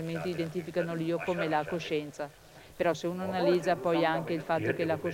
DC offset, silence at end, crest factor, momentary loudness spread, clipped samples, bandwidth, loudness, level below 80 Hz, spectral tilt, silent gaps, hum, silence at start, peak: under 0.1%; 0 s; 18 dB; 7 LU; under 0.1%; 16.5 kHz; -31 LUFS; -64 dBFS; -6 dB/octave; none; none; 0 s; -14 dBFS